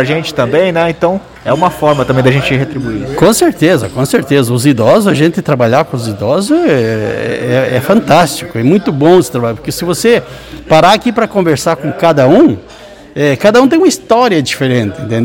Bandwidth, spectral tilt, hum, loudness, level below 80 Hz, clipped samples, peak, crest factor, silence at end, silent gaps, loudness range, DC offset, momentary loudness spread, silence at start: 17.5 kHz; -5.5 dB/octave; none; -10 LUFS; -40 dBFS; 2%; 0 dBFS; 10 dB; 0 s; none; 2 LU; under 0.1%; 8 LU; 0 s